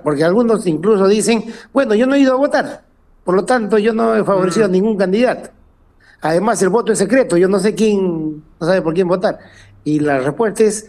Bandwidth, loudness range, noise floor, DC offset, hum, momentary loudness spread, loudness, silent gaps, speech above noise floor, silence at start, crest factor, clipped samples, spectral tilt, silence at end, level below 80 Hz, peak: 13.5 kHz; 1 LU; -49 dBFS; under 0.1%; none; 8 LU; -15 LUFS; none; 35 dB; 0.05 s; 14 dB; under 0.1%; -5.5 dB/octave; 0 s; -50 dBFS; -2 dBFS